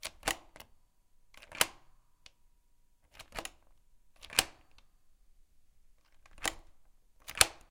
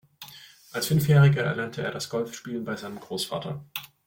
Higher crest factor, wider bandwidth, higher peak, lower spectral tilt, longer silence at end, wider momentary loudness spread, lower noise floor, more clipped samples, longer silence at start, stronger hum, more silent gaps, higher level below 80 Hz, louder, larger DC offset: first, 40 dB vs 18 dB; about the same, 16.5 kHz vs 17 kHz; first, 0 dBFS vs -8 dBFS; second, 0 dB/octave vs -6 dB/octave; about the same, 0.15 s vs 0.2 s; first, 23 LU vs 18 LU; first, -66 dBFS vs -48 dBFS; neither; second, 0.05 s vs 0.2 s; neither; neither; about the same, -58 dBFS vs -60 dBFS; second, -33 LUFS vs -26 LUFS; neither